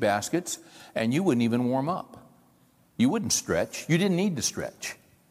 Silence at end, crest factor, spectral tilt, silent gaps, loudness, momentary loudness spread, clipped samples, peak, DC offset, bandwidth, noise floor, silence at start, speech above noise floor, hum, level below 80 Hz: 0.35 s; 16 dB; -4.5 dB/octave; none; -27 LUFS; 13 LU; under 0.1%; -10 dBFS; under 0.1%; 16 kHz; -62 dBFS; 0 s; 35 dB; none; -62 dBFS